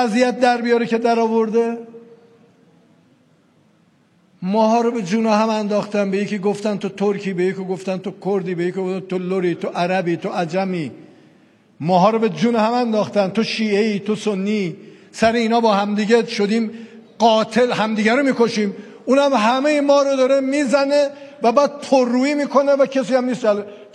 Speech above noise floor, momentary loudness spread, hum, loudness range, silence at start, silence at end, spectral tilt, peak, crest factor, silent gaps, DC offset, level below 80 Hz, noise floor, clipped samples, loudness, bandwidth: 39 dB; 8 LU; none; 6 LU; 0 s; 0.1 s; -5.5 dB/octave; -2 dBFS; 16 dB; none; under 0.1%; -66 dBFS; -57 dBFS; under 0.1%; -18 LUFS; 10.5 kHz